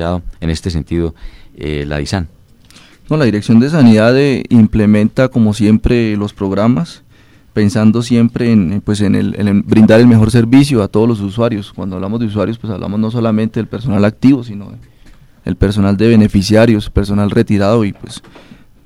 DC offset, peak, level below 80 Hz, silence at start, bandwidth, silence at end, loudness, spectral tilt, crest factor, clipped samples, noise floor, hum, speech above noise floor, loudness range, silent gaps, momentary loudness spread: 0.3%; 0 dBFS; -30 dBFS; 0 s; 12 kHz; 0.65 s; -12 LUFS; -7.5 dB/octave; 12 dB; 0.4%; -45 dBFS; none; 34 dB; 6 LU; none; 13 LU